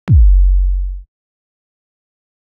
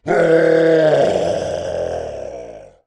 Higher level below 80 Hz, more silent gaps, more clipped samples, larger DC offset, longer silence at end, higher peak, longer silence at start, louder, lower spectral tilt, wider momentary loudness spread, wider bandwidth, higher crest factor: first, -14 dBFS vs -48 dBFS; neither; neither; neither; first, 1.4 s vs 0.2 s; about the same, -2 dBFS vs -2 dBFS; about the same, 0.05 s vs 0.05 s; about the same, -14 LUFS vs -16 LUFS; first, -10.5 dB/octave vs -6 dB/octave; about the same, 17 LU vs 18 LU; second, 2.3 kHz vs 10.5 kHz; about the same, 12 dB vs 14 dB